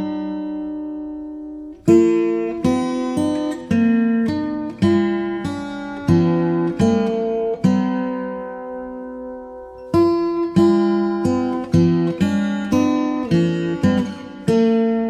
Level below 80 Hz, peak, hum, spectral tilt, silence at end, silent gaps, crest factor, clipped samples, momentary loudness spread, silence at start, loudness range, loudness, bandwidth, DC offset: -48 dBFS; -2 dBFS; none; -7.5 dB/octave; 0 s; none; 16 dB; under 0.1%; 14 LU; 0 s; 3 LU; -19 LUFS; 11 kHz; under 0.1%